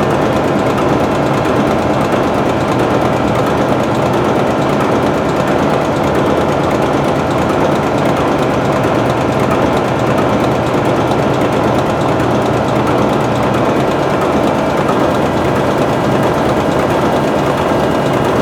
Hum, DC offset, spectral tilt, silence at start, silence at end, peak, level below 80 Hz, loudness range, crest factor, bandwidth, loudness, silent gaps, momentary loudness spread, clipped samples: none; under 0.1%; -6.5 dB/octave; 0 s; 0 s; 0 dBFS; -36 dBFS; 0 LU; 12 dB; over 20 kHz; -13 LUFS; none; 1 LU; under 0.1%